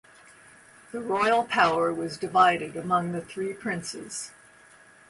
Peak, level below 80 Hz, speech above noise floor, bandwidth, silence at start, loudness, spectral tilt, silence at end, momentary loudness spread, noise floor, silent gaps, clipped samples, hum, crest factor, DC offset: -8 dBFS; -66 dBFS; 28 dB; 11.5 kHz; 0.95 s; -26 LUFS; -4 dB/octave; 0.8 s; 15 LU; -54 dBFS; none; under 0.1%; none; 20 dB; under 0.1%